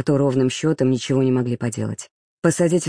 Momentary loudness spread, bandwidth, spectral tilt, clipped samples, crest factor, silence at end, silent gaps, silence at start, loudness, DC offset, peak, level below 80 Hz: 9 LU; 10.5 kHz; -6 dB/octave; under 0.1%; 14 dB; 0 s; 2.11-2.42 s; 0 s; -20 LUFS; under 0.1%; -6 dBFS; -60 dBFS